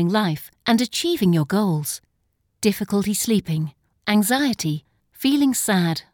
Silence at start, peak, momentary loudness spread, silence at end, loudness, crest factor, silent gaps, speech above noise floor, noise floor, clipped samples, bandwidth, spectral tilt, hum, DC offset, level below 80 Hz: 0 s; -4 dBFS; 8 LU; 0.1 s; -21 LUFS; 16 dB; none; 49 dB; -70 dBFS; under 0.1%; 19.5 kHz; -4.5 dB/octave; none; under 0.1%; -58 dBFS